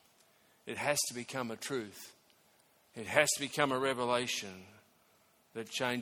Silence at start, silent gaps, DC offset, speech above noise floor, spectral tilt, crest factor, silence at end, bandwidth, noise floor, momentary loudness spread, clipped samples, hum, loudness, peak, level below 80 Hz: 0.65 s; none; under 0.1%; 34 dB; -2.5 dB/octave; 28 dB; 0 s; 18 kHz; -69 dBFS; 21 LU; under 0.1%; none; -34 LUFS; -8 dBFS; -76 dBFS